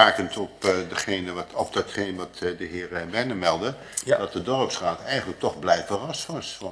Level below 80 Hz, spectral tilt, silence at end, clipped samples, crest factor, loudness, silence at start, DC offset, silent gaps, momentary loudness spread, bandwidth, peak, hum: -58 dBFS; -3.5 dB/octave; 0 s; under 0.1%; 26 dB; -26 LUFS; 0 s; under 0.1%; none; 7 LU; 11 kHz; 0 dBFS; none